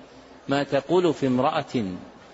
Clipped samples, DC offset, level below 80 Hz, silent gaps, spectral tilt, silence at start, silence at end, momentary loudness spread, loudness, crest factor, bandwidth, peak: under 0.1%; under 0.1%; -60 dBFS; none; -6.5 dB/octave; 0 s; 0.2 s; 13 LU; -24 LUFS; 16 dB; 8 kHz; -10 dBFS